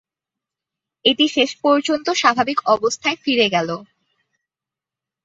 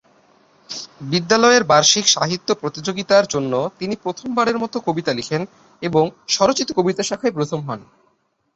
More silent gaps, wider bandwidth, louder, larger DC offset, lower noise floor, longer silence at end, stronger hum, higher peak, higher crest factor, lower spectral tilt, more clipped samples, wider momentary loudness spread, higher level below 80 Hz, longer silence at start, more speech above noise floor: neither; about the same, 8 kHz vs 8.2 kHz; about the same, -18 LUFS vs -18 LUFS; neither; first, -88 dBFS vs -65 dBFS; first, 1.4 s vs 0.7 s; neither; about the same, -2 dBFS vs 0 dBFS; about the same, 18 dB vs 18 dB; about the same, -3 dB/octave vs -3 dB/octave; neither; second, 5 LU vs 15 LU; second, -64 dBFS vs -58 dBFS; first, 1.05 s vs 0.7 s; first, 70 dB vs 46 dB